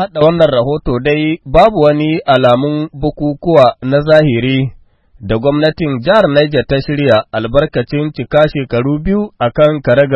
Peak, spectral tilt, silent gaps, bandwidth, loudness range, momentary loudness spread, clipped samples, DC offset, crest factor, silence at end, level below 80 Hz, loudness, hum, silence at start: 0 dBFS; -8.5 dB/octave; none; 7 kHz; 2 LU; 8 LU; 0.3%; under 0.1%; 12 dB; 0 s; -32 dBFS; -12 LUFS; none; 0 s